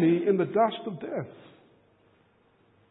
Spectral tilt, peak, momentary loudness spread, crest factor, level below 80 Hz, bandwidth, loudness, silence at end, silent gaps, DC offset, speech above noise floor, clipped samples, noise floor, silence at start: -11 dB/octave; -10 dBFS; 13 LU; 18 dB; -76 dBFS; 4 kHz; -27 LUFS; 1.55 s; none; under 0.1%; 38 dB; under 0.1%; -64 dBFS; 0 s